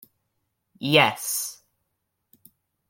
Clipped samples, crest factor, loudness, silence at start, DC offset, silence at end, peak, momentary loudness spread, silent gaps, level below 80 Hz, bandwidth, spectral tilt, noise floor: under 0.1%; 26 dB; -22 LUFS; 0.8 s; under 0.1%; 1.35 s; -2 dBFS; 15 LU; none; -72 dBFS; 17 kHz; -3 dB/octave; -78 dBFS